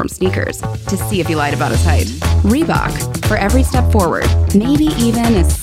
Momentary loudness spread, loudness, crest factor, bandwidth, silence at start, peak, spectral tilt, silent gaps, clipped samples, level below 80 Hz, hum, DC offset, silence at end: 6 LU; -15 LUFS; 14 dB; 16 kHz; 0 s; 0 dBFS; -6 dB/octave; none; under 0.1%; -22 dBFS; none; under 0.1%; 0 s